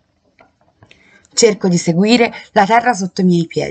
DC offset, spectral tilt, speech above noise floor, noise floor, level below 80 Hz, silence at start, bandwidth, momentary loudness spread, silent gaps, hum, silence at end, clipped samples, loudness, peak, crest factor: under 0.1%; -5 dB/octave; 40 dB; -53 dBFS; -58 dBFS; 1.35 s; 9.2 kHz; 5 LU; none; none; 0 s; under 0.1%; -14 LUFS; 0 dBFS; 16 dB